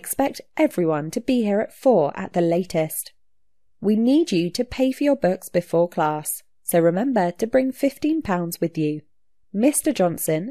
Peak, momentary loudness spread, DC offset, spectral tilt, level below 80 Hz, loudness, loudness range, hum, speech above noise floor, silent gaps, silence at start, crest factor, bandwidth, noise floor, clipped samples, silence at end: -6 dBFS; 7 LU; 0.2%; -5.5 dB/octave; -56 dBFS; -22 LUFS; 1 LU; none; 55 dB; none; 0.05 s; 16 dB; 14 kHz; -76 dBFS; under 0.1%; 0 s